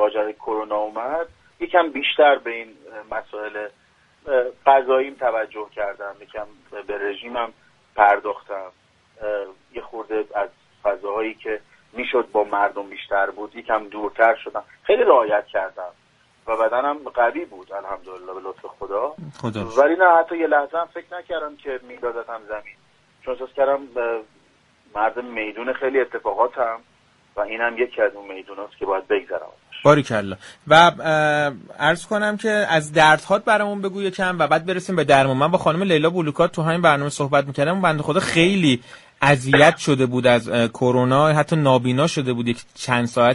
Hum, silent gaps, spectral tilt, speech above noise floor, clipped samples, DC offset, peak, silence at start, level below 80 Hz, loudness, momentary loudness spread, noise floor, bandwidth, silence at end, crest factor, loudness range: none; none; -5.5 dB/octave; 38 dB; under 0.1%; under 0.1%; 0 dBFS; 0 s; -58 dBFS; -20 LUFS; 18 LU; -58 dBFS; 11.5 kHz; 0 s; 20 dB; 9 LU